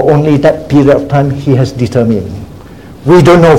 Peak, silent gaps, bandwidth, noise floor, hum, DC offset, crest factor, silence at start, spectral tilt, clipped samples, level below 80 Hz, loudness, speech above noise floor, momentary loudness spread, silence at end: 0 dBFS; none; 13.5 kHz; -30 dBFS; none; 0.8%; 8 dB; 0 s; -8 dB/octave; 2%; -34 dBFS; -9 LUFS; 23 dB; 14 LU; 0 s